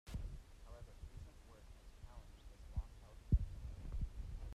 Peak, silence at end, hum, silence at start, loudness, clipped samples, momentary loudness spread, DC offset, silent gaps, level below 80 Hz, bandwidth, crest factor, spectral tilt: -22 dBFS; 0 s; none; 0.05 s; -48 LUFS; under 0.1%; 21 LU; under 0.1%; none; -48 dBFS; 13 kHz; 24 dB; -7.5 dB/octave